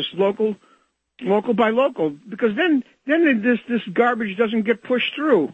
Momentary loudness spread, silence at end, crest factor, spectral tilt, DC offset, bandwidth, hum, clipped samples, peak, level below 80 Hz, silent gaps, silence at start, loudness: 7 LU; 0 s; 16 dB; -7.5 dB/octave; under 0.1%; 7.8 kHz; none; under 0.1%; -4 dBFS; -70 dBFS; none; 0 s; -20 LUFS